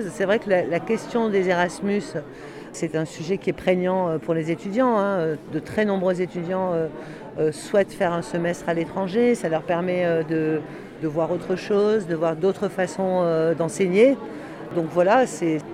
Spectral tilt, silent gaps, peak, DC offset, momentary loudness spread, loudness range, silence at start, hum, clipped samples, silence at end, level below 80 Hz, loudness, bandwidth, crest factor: -6.5 dB/octave; none; -6 dBFS; under 0.1%; 9 LU; 3 LU; 0 s; none; under 0.1%; 0 s; -58 dBFS; -23 LUFS; 13.5 kHz; 18 dB